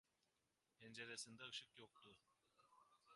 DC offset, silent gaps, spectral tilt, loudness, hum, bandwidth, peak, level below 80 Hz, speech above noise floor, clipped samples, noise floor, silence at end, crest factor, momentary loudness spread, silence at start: under 0.1%; none; -1.5 dB/octave; -56 LUFS; none; 11.5 kHz; -38 dBFS; under -90 dBFS; 30 dB; under 0.1%; -89 dBFS; 0 s; 24 dB; 14 LU; 0.8 s